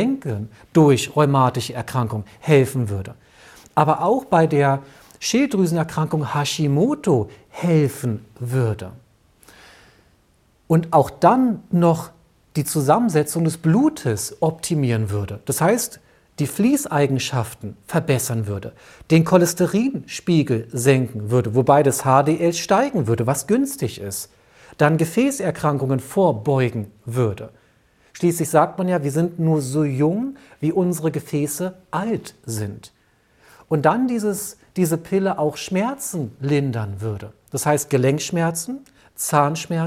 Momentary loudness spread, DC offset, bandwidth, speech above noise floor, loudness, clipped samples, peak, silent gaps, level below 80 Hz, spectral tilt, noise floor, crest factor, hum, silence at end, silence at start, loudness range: 12 LU; under 0.1%; 16.5 kHz; 39 dB; -20 LUFS; under 0.1%; -2 dBFS; none; -56 dBFS; -6 dB/octave; -59 dBFS; 18 dB; none; 0 s; 0 s; 5 LU